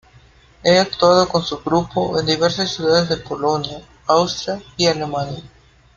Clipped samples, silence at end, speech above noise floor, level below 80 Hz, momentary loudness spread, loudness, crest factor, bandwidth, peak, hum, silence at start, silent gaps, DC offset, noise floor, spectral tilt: under 0.1%; 0.5 s; 31 dB; -48 dBFS; 11 LU; -18 LUFS; 18 dB; 7.4 kHz; -2 dBFS; none; 0.65 s; none; under 0.1%; -49 dBFS; -4.5 dB/octave